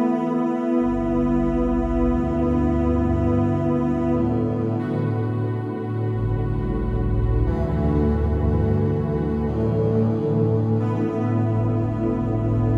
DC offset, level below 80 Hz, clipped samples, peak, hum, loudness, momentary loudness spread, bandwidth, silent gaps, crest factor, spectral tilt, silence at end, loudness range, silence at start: under 0.1%; -30 dBFS; under 0.1%; -10 dBFS; none; -22 LUFS; 3 LU; 4.7 kHz; none; 12 dB; -10.5 dB/octave; 0 s; 3 LU; 0 s